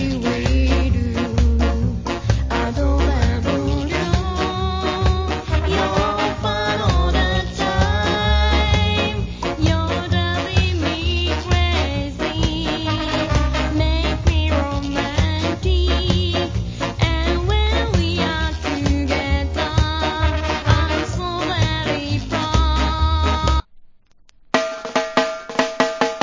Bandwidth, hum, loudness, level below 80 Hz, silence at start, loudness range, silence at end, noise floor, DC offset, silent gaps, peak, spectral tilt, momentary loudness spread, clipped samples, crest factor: 7.6 kHz; none; -20 LUFS; -22 dBFS; 0 s; 2 LU; 0 s; -50 dBFS; under 0.1%; none; 0 dBFS; -5.5 dB/octave; 4 LU; under 0.1%; 18 dB